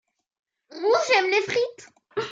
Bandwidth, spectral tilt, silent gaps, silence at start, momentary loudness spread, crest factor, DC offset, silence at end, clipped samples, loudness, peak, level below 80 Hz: 7.8 kHz; -2.5 dB/octave; none; 0.7 s; 12 LU; 18 dB; under 0.1%; 0 s; under 0.1%; -23 LUFS; -8 dBFS; -76 dBFS